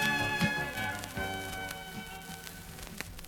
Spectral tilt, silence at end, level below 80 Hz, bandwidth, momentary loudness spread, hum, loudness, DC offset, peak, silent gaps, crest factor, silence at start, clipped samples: -3.5 dB/octave; 0 s; -52 dBFS; 18 kHz; 14 LU; none; -35 LUFS; under 0.1%; -12 dBFS; none; 24 dB; 0 s; under 0.1%